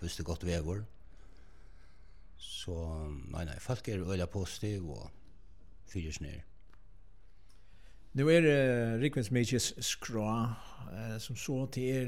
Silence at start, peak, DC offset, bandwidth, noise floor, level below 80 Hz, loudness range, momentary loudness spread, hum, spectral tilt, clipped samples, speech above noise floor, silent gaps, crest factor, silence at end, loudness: 0 s; -14 dBFS; 0.3%; 16.5 kHz; -60 dBFS; -52 dBFS; 13 LU; 17 LU; none; -5 dB/octave; under 0.1%; 27 dB; none; 20 dB; 0 s; -34 LUFS